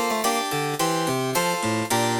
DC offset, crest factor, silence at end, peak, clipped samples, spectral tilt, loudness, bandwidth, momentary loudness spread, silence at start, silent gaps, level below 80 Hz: under 0.1%; 14 dB; 0 s; -10 dBFS; under 0.1%; -3.5 dB/octave; -23 LUFS; over 20 kHz; 2 LU; 0 s; none; -62 dBFS